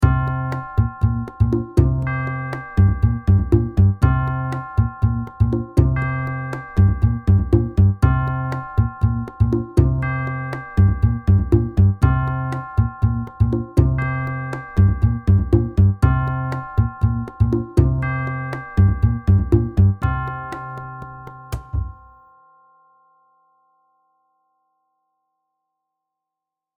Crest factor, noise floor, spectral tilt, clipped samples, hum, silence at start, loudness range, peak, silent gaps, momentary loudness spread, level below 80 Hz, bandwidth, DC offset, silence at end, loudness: 18 dB; -85 dBFS; -9.5 dB/octave; under 0.1%; none; 0 s; 5 LU; 0 dBFS; none; 10 LU; -26 dBFS; 4.9 kHz; under 0.1%; 4.85 s; -19 LUFS